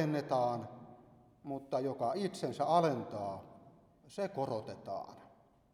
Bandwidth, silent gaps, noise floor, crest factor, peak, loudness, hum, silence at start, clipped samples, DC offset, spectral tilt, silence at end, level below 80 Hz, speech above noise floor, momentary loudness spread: 14 kHz; none; -64 dBFS; 20 dB; -16 dBFS; -37 LUFS; none; 0 s; under 0.1%; under 0.1%; -6.5 dB/octave; 0.45 s; -76 dBFS; 28 dB; 20 LU